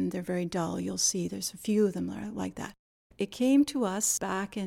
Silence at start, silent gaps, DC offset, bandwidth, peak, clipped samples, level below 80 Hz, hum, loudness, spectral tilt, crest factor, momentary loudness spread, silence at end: 0 s; 2.79-3.10 s; under 0.1%; 17 kHz; -14 dBFS; under 0.1%; -62 dBFS; none; -29 LUFS; -4 dB/octave; 16 dB; 12 LU; 0 s